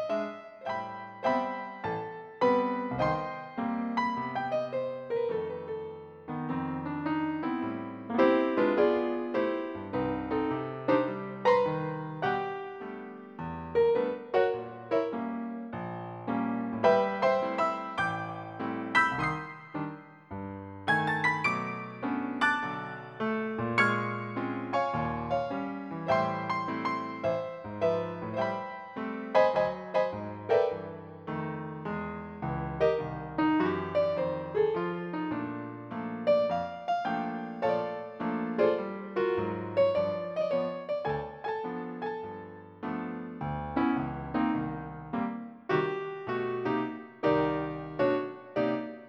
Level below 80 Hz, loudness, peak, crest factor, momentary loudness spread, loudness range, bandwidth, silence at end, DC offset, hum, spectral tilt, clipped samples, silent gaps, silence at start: -60 dBFS; -31 LUFS; -12 dBFS; 20 dB; 12 LU; 4 LU; 10 kHz; 0 s; under 0.1%; none; -7 dB/octave; under 0.1%; none; 0 s